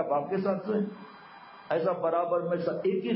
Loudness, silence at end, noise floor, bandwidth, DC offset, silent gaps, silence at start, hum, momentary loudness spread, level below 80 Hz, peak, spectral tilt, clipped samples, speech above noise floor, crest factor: -29 LUFS; 0 s; -49 dBFS; 5.8 kHz; under 0.1%; none; 0 s; none; 20 LU; -78 dBFS; -16 dBFS; -11 dB/octave; under 0.1%; 21 dB; 14 dB